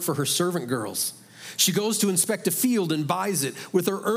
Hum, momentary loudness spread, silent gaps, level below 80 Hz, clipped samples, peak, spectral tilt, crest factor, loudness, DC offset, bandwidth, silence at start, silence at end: none; 7 LU; none; -78 dBFS; under 0.1%; -6 dBFS; -3.5 dB/octave; 18 dB; -24 LUFS; under 0.1%; 16.5 kHz; 0 s; 0 s